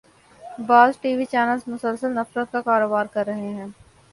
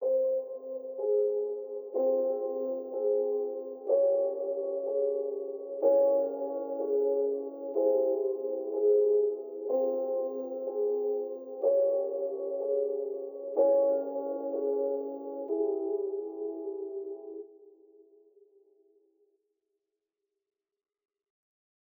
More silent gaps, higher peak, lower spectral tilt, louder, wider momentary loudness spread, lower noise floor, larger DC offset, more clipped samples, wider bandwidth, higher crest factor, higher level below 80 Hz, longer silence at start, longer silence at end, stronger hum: neither; first, -2 dBFS vs -14 dBFS; second, -6 dB/octave vs -10 dB/octave; first, -21 LUFS vs -31 LUFS; first, 18 LU vs 12 LU; second, -43 dBFS vs -87 dBFS; neither; neither; second, 11.5 kHz vs over 20 kHz; about the same, 20 dB vs 16 dB; first, -64 dBFS vs under -90 dBFS; first, 0.4 s vs 0 s; second, 0.4 s vs 4.25 s; neither